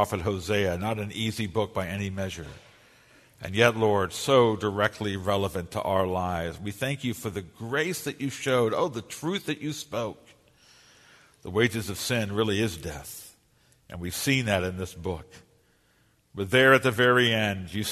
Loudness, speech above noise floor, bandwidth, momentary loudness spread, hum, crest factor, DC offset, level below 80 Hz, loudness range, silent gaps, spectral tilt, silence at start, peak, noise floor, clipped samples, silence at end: -26 LUFS; 38 dB; 13.5 kHz; 15 LU; none; 22 dB; under 0.1%; -54 dBFS; 6 LU; none; -4.5 dB/octave; 0 s; -4 dBFS; -65 dBFS; under 0.1%; 0 s